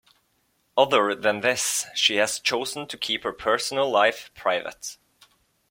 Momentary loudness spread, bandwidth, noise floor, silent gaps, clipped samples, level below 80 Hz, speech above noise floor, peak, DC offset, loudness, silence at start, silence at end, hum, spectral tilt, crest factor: 9 LU; 16.5 kHz; -69 dBFS; none; under 0.1%; -64 dBFS; 45 dB; -4 dBFS; under 0.1%; -23 LUFS; 0.75 s; 0.75 s; none; -1.5 dB/octave; 22 dB